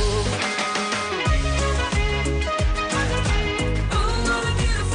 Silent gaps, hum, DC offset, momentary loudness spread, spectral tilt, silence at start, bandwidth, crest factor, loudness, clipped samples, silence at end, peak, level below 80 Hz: none; none; under 0.1%; 1 LU; -4.5 dB/octave; 0 s; 10 kHz; 12 dB; -22 LUFS; under 0.1%; 0 s; -10 dBFS; -26 dBFS